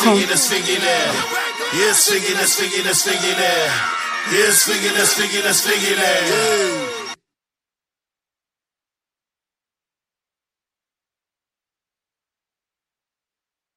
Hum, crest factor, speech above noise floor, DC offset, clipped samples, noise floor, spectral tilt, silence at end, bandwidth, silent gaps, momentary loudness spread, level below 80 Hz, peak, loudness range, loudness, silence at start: none; 20 dB; 72 dB; under 0.1%; under 0.1%; -89 dBFS; -1 dB/octave; 6.6 s; 15.5 kHz; none; 8 LU; -66 dBFS; 0 dBFS; 7 LU; -16 LUFS; 0 s